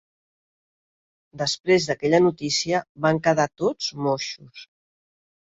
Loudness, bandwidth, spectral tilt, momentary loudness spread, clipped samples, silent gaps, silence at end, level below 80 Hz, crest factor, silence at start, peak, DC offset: -22 LUFS; 8 kHz; -4.5 dB/octave; 8 LU; under 0.1%; 1.60-1.64 s, 2.89-2.95 s; 0.95 s; -62 dBFS; 20 dB; 1.35 s; -6 dBFS; under 0.1%